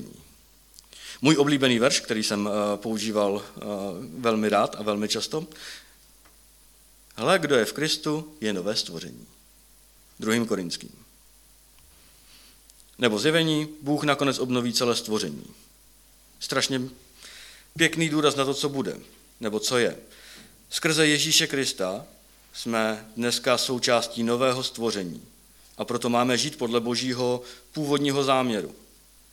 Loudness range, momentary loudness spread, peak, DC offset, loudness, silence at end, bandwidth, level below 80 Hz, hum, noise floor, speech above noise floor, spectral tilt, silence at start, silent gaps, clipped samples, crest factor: 5 LU; 19 LU; -4 dBFS; under 0.1%; -25 LUFS; 0.55 s; 19 kHz; -62 dBFS; none; -55 dBFS; 30 dB; -3.5 dB/octave; 0 s; none; under 0.1%; 24 dB